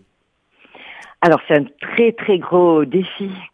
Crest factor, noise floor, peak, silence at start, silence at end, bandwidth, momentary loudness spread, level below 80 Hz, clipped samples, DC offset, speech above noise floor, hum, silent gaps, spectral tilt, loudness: 18 dB; -65 dBFS; 0 dBFS; 0.85 s; 0.05 s; 6.8 kHz; 19 LU; -64 dBFS; under 0.1%; under 0.1%; 50 dB; none; none; -7.5 dB/octave; -16 LUFS